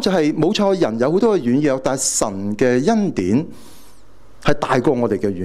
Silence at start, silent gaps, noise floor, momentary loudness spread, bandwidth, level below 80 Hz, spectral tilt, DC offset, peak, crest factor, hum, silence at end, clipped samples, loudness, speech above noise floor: 0 s; none; -49 dBFS; 5 LU; 15 kHz; -44 dBFS; -5 dB/octave; under 0.1%; 0 dBFS; 18 dB; none; 0 s; under 0.1%; -18 LUFS; 32 dB